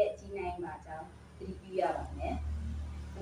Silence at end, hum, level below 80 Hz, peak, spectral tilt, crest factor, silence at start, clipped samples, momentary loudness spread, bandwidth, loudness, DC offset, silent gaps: 0 s; none; -44 dBFS; -18 dBFS; -7 dB/octave; 20 dB; 0 s; under 0.1%; 12 LU; 10.5 kHz; -39 LUFS; under 0.1%; none